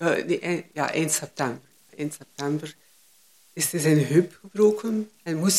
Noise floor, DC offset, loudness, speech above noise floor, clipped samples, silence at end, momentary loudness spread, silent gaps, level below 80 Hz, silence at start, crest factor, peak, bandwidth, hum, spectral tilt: -58 dBFS; under 0.1%; -25 LUFS; 34 dB; under 0.1%; 0 s; 13 LU; none; -70 dBFS; 0 s; 18 dB; -6 dBFS; 16 kHz; none; -4.5 dB/octave